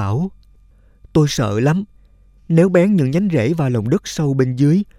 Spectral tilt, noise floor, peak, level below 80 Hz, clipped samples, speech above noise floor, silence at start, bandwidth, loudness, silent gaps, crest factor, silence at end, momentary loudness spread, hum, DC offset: -7 dB/octave; -49 dBFS; 0 dBFS; -44 dBFS; under 0.1%; 34 dB; 0 s; 14.5 kHz; -17 LUFS; none; 16 dB; 0.15 s; 8 LU; none; under 0.1%